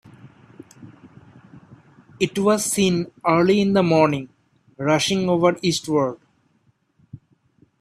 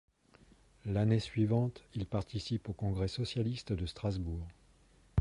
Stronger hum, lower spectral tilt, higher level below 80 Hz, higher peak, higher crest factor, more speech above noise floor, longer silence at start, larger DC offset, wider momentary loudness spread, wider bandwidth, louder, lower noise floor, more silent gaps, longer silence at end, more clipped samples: neither; second, -5 dB/octave vs -7.5 dB/octave; second, -60 dBFS vs -50 dBFS; first, -2 dBFS vs -18 dBFS; about the same, 20 dB vs 18 dB; first, 45 dB vs 30 dB; about the same, 0.8 s vs 0.85 s; neither; about the same, 9 LU vs 10 LU; first, 14 kHz vs 11 kHz; first, -20 LUFS vs -36 LUFS; about the same, -64 dBFS vs -65 dBFS; neither; first, 0.65 s vs 0 s; neither